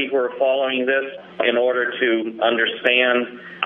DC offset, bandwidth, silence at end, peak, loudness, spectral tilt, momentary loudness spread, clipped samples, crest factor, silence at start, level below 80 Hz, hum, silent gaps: under 0.1%; 4 kHz; 0 s; -2 dBFS; -19 LUFS; -6 dB/octave; 6 LU; under 0.1%; 18 dB; 0 s; -72 dBFS; none; none